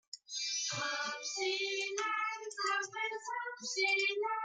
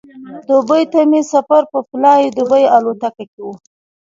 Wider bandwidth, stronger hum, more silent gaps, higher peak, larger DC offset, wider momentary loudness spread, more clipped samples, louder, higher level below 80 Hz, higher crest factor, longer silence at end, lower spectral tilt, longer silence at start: first, 10 kHz vs 7.8 kHz; neither; second, none vs 3.28-3.38 s; second, -22 dBFS vs 0 dBFS; neither; second, 7 LU vs 19 LU; neither; second, -35 LUFS vs -13 LUFS; second, under -90 dBFS vs -64 dBFS; about the same, 16 dB vs 14 dB; second, 0 s vs 0.6 s; second, -0.5 dB/octave vs -5 dB/octave; about the same, 0.15 s vs 0.15 s